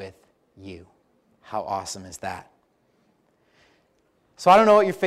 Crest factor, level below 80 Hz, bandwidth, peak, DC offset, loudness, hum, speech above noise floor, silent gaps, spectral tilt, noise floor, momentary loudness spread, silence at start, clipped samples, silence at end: 20 dB; -62 dBFS; 14.5 kHz; -6 dBFS; under 0.1%; -21 LUFS; none; 45 dB; none; -4.5 dB/octave; -66 dBFS; 28 LU; 0 s; under 0.1%; 0 s